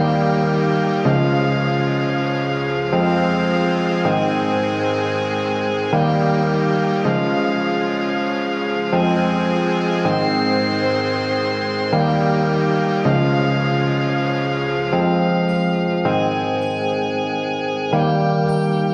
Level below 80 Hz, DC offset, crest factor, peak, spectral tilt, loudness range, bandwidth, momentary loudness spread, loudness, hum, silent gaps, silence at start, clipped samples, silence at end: -52 dBFS; under 0.1%; 12 dB; -6 dBFS; -7 dB/octave; 1 LU; 9.8 kHz; 4 LU; -19 LUFS; none; none; 0 s; under 0.1%; 0 s